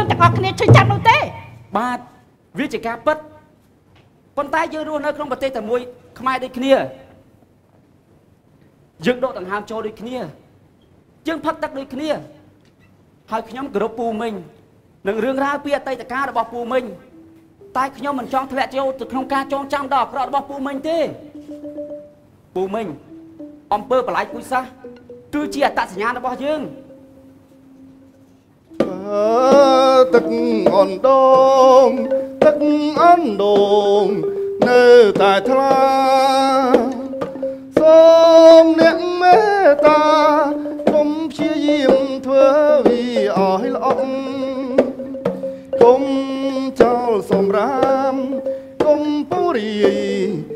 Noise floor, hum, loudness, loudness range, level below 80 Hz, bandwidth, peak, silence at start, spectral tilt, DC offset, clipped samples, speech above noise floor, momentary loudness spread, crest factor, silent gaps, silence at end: -53 dBFS; none; -16 LUFS; 15 LU; -52 dBFS; 14 kHz; 0 dBFS; 0 s; -6.5 dB/octave; under 0.1%; under 0.1%; 38 dB; 16 LU; 16 dB; none; 0 s